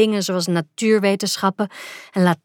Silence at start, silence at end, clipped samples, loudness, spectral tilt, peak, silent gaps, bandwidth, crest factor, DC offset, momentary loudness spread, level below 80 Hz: 0 s; 0.1 s; under 0.1%; -20 LUFS; -5 dB/octave; -4 dBFS; none; 18 kHz; 16 dB; under 0.1%; 9 LU; -74 dBFS